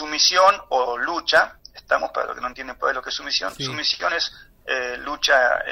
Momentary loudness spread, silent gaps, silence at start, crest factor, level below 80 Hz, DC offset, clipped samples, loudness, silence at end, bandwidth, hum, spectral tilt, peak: 11 LU; none; 0 s; 16 dB; -54 dBFS; under 0.1%; under 0.1%; -21 LUFS; 0 s; 16 kHz; none; -1 dB/octave; -6 dBFS